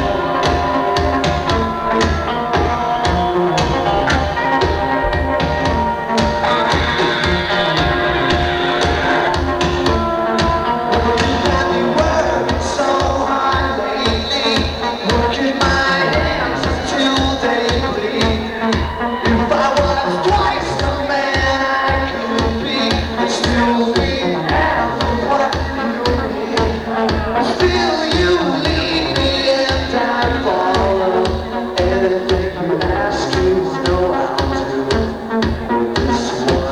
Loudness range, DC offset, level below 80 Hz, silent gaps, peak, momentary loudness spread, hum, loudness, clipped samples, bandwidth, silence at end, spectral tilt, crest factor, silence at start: 1 LU; under 0.1%; -28 dBFS; none; -2 dBFS; 4 LU; none; -16 LUFS; under 0.1%; 12.5 kHz; 0 s; -5 dB/octave; 14 dB; 0 s